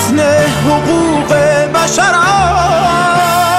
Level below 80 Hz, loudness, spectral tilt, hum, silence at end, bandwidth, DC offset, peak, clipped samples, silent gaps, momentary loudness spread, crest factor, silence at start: -32 dBFS; -10 LUFS; -4 dB/octave; none; 0 s; 16.5 kHz; under 0.1%; -2 dBFS; under 0.1%; none; 2 LU; 8 dB; 0 s